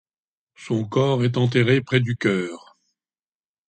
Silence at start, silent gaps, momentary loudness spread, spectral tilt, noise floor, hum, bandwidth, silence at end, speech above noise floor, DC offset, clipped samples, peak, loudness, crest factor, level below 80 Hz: 0.6 s; none; 9 LU; -7 dB/octave; under -90 dBFS; none; 8.8 kHz; 1.1 s; over 70 dB; under 0.1%; under 0.1%; -6 dBFS; -21 LUFS; 18 dB; -60 dBFS